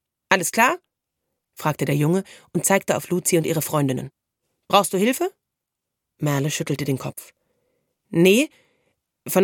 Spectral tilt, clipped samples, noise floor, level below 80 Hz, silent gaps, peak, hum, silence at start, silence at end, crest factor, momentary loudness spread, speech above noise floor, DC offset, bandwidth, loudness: -4.5 dB/octave; under 0.1%; -83 dBFS; -66 dBFS; none; 0 dBFS; none; 0.3 s; 0 s; 22 dB; 12 LU; 62 dB; under 0.1%; 17.5 kHz; -21 LUFS